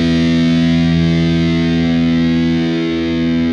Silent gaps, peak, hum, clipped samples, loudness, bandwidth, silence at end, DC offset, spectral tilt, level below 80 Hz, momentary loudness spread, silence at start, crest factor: none; -4 dBFS; none; under 0.1%; -14 LUFS; 7.4 kHz; 0 s; under 0.1%; -7 dB/octave; -32 dBFS; 4 LU; 0 s; 10 dB